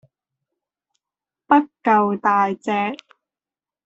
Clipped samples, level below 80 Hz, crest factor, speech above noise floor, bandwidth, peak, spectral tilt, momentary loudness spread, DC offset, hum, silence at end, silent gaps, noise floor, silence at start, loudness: under 0.1%; -70 dBFS; 20 dB; over 71 dB; 8 kHz; -2 dBFS; -6.5 dB/octave; 7 LU; under 0.1%; none; 0.9 s; none; under -90 dBFS; 1.5 s; -19 LUFS